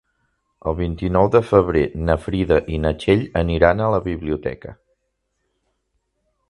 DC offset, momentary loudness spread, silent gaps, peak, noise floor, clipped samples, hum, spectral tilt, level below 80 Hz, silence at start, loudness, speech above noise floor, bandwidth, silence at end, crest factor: under 0.1%; 11 LU; none; 0 dBFS; -73 dBFS; under 0.1%; none; -8 dB/octave; -34 dBFS; 0.65 s; -19 LUFS; 55 dB; 11 kHz; 1.75 s; 20 dB